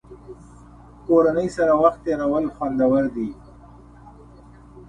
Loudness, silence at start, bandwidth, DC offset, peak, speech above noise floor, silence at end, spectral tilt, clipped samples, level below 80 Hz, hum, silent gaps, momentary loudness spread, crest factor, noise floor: -20 LUFS; 0.1 s; 10 kHz; under 0.1%; -4 dBFS; 26 dB; 0.05 s; -7.5 dB/octave; under 0.1%; -48 dBFS; none; none; 17 LU; 18 dB; -46 dBFS